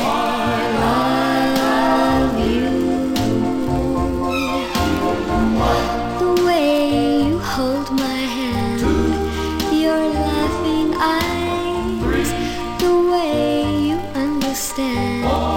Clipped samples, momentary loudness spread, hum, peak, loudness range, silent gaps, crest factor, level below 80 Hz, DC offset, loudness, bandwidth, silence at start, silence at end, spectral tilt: under 0.1%; 5 LU; none; -4 dBFS; 2 LU; none; 14 dB; -32 dBFS; under 0.1%; -18 LUFS; 17 kHz; 0 s; 0 s; -5.5 dB/octave